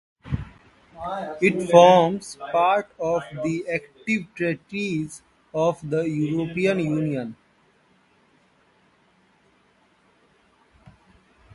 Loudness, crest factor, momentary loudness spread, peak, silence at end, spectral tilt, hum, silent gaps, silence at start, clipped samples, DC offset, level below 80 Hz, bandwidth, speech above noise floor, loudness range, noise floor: -22 LUFS; 24 dB; 17 LU; 0 dBFS; 4.2 s; -6 dB/octave; none; none; 0.25 s; under 0.1%; under 0.1%; -52 dBFS; 11.5 kHz; 40 dB; 9 LU; -61 dBFS